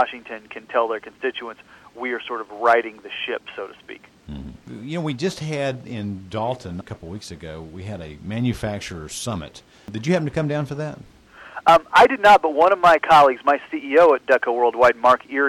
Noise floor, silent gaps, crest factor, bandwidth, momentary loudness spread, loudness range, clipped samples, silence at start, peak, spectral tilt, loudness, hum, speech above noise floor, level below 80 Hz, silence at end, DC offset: -39 dBFS; none; 16 dB; 16 kHz; 21 LU; 14 LU; under 0.1%; 0 s; -4 dBFS; -5 dB/octave; -19 LUFS; none; 19 dB; -50 dBFS; 0 s; under 0.1%